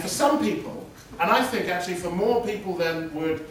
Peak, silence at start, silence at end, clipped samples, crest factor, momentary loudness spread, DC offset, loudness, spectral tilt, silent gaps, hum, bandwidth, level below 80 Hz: -6 dBFS; 0 s; 0 s; under 0.1%; 20 dB; 10 LU; under 0.1%; -25 LUFS; -4 dB/octave; none; none; 16 kHz; -54 dBFS